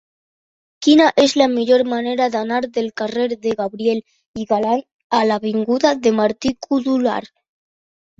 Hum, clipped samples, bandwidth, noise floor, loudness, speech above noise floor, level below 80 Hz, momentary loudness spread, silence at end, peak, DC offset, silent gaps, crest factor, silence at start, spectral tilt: none; under 0.1%; 8 kHz; under -90 dBFS; -18 LUFS; over 73 dB; -58 dBFS; 9 LU; 0.95 s; -2 dBFS; under 0.1%; 4.26-4.34 s, 4.94-5.10 s; 16 dB; 0.8 s; -4.5 dB/octave